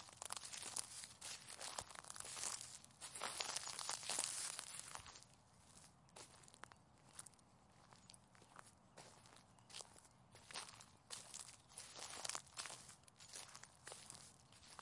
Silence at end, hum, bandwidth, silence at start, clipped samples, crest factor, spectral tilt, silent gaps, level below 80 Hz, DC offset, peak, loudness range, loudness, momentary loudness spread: 0 s; none; 12 kHz; 0 s; under 0.1%; 34 dB; 0 dB/octave; none; -82 dBFS; under 0.1%; -20 dBFS; 16 LU; -50 LUFS; 20 LU